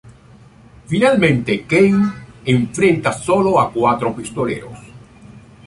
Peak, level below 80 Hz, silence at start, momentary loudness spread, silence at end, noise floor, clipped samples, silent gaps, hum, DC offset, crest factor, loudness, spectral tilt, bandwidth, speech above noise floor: -2 dBFS; -48 dBFS; 0.05 s; 10 LU; 0.3 s; -44 dBFS; under 0.1%; none; none; under 0.1%; 16 dB; -16 LUFS; -6 dB/octave; 11.5 kHz; 29 dB